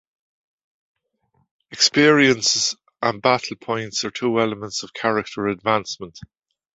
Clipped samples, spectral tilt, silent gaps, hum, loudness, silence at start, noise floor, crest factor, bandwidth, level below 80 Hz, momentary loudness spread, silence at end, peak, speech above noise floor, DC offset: under 0.1%; -3 dB/octave; none; none; -20 LUFS; 1.7 s; -67 dBFS; 20 dB; 8.2 kHz; -60 dBFS; 14 LU; 0.5 s; -2 dBFS; 47 dB; under 0.1%